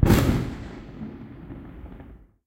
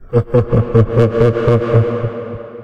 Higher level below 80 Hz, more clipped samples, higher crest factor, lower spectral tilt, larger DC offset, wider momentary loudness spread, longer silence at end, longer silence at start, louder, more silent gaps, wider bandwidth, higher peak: about the same, -32 dBFS vs -32 dBFS; neither; first, 22 dB vs 14 dB; second, -6.5 dB/octave vs -10 dB/octave; second, under 0.1% vs 0.7%; first, 23 LU vs 10 LU; first, 0.3 s vs 0 s; about the same, 0 s vs 0 s; second, -26 LUFS vs -14 LUFS; neither; first, 16 kHz vs 5.6 kHz; second, -4 dBFS vs 0 dBFS